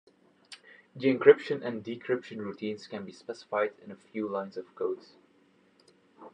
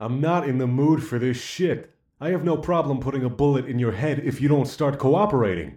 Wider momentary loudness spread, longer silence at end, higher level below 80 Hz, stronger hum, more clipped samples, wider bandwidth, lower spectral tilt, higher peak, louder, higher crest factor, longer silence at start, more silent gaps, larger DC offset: first, 27 LU vs 5 LU; about the same, 0.05 s vs 0 s; second, -84 dBFS vs -50 dBFS; neither; neither; second, 9.4 kHz vs 13.5 kHz; about the same, -6.5 dB/octave vs -7.5 dB/octave; about the same, -6 dBFS vs -8 dBFS; second, -30 LUFS vs -23 LUFS; first, 26 dB vs 14 dB; first, 0.5 s vs 0 s; neither; neither